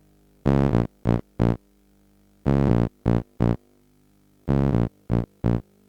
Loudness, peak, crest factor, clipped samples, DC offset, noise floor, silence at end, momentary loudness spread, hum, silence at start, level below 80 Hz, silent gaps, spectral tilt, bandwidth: -24 LUFS; -4 dBFS; 20 dB; under 0.1%; under 0.1%; -60 dBFS; 0.25 s; 7 LU; 50 Hz at -55 dBFS; 0.45 s; -34 dBFS; none; -10 dB/octave; 7 kHz